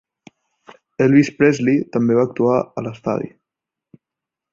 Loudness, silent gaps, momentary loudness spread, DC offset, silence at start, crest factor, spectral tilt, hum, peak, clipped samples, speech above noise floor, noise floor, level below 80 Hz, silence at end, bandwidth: -17 LUFS; none; 12 LU; under 0.1%; 1 s; 18 dB; -7.5 dB/octave; none; -2 dBFS; under 0.1%; 69 dB; -85 dBFS; -60 dBFS; 1.25 s; 7.6 kHz